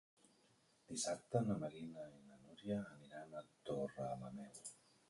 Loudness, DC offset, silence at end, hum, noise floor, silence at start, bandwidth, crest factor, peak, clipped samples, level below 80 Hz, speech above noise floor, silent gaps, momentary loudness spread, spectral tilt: -46 LUFS; under 0.1%; 0.35 s; none; -75 dBFS; 0.9 s; 11.5 kHz; 22 dB; -26 dBFS; under 0.1%; -78 dBFS; 29 dB; none; 15 LU; -5 dB/octave